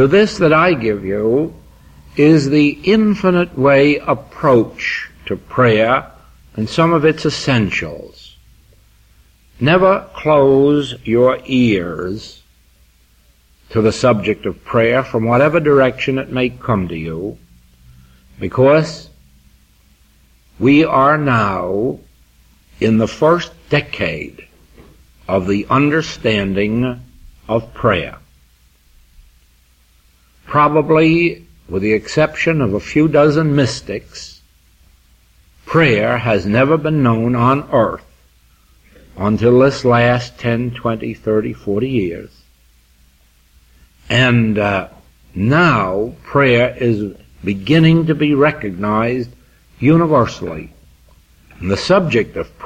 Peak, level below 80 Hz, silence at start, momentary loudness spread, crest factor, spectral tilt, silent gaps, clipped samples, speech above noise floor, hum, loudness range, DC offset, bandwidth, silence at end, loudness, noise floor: -2 dBFS; -42 dBFS; 0 s; 13 LU; 14 dB; -7 dB/octave; none; under 0.1%; 38 dB; none; 5 LU; under 0.1%; 9.6 kHz; 0 s; -15 LUFS; -52 dBFS